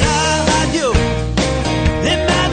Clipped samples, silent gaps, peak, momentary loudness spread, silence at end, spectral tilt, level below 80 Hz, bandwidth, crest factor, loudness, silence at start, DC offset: under 0.1%; none; -2 dBFS; 3 LU; 0 s; -4.5 dB/octave; -24 dBFS; 9.6 kHz; 14 dB; -15 LUFS; 0 s; under 0.1%